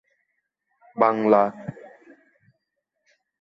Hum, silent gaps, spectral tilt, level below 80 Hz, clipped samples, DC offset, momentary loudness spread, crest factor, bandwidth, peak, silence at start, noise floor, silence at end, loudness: none; none; -9 dB/octave; -70 dBFS; under 0.1%; under 0.1%; 20 LU; 24 dB; 7.4 kHz; -4 dBFS; 0.95 s; -79 dBFS; 1.7 s; -20 LUFS